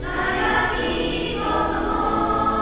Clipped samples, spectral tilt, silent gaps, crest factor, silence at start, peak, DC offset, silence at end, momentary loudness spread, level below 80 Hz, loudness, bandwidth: under 0.1%; -9 dB/octave; none; 14 dB; 0 s; -8 dBFS; 0.5%; 0 s; 4 LU; -34 dBFS; -22 LUFS; 4 kHz